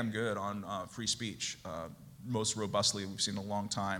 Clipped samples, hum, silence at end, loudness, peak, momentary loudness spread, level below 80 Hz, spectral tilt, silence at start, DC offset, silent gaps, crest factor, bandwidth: under 0.1%; none; 0 s; -35 LUFS; -16 dBFS; 12 LU; -66 dBFS; -3 dB/octave; 0 s; under 0.1%; none; 20 dB; 17.5 kHz